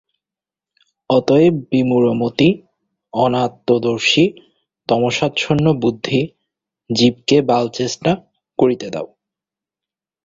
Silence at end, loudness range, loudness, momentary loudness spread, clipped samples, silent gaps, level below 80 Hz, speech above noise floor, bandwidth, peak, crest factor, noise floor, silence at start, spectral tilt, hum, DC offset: 1.2 s; 2 LU; -17 LUFS; 11 LU; under 0.1%; none; -52 dBFS; 73 dB; 7.8 kHz; -2 dBFS; 16 dB; -89 dBFS; 1.1 s; -5.5 dB/octave; none; under 0.1%